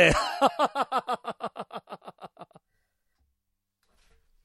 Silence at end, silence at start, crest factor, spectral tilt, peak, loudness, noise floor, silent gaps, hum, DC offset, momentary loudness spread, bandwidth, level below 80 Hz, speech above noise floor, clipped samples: 2 s; 0 s; 24 dB; -4 dB/octave; -4 dBFS; -27 LUFS; -81 dBFS; none; none; under 0.1%; 22 LU; 15.5 kHz; -48 dBFS; 56 dB; under 0.1%